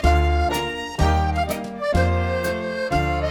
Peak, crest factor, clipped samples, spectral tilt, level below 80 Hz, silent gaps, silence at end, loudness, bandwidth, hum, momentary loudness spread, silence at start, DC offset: -6 dBFS; 16 dB; under 0.1%; -6 dB/octave; -26 dBFS; none; 0 s; -22 LUFS; 19.5 kHz; none; 6 LU; 0 s; under 0.1%